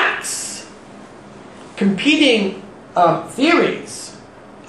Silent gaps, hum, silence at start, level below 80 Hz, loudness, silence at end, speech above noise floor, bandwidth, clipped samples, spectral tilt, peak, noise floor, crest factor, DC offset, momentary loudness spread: none; none; 0 s; -60 dBFS; -17 LUFS; 0.1 s; 24 dB; 12.5 kHz; under 0.1%; -3.5 dB/octave; -2 dBFS; -40 dBFS; 18 dB; 0.1%; 22 LU